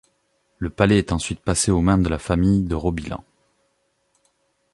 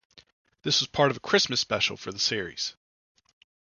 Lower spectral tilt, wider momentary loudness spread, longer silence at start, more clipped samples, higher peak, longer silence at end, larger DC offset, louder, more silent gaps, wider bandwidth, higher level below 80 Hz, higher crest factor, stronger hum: first, -5.5 dB/octave vs -2.5 dB/octave; first, 13 LU vs 10 LU; about the same, 0.6 s vs 0.65 s; neither; first, -2 dBFS vs -6 dBFS; first, 1.55 s vs 1 s; neither; first, -21 LUFS vs -26 LUFS; neither; first, 11.5 kHz vs 7.4 kHz; first, -36 dBFS vs -62 dBFS; about the same, 20 dB vs 22 dB; neither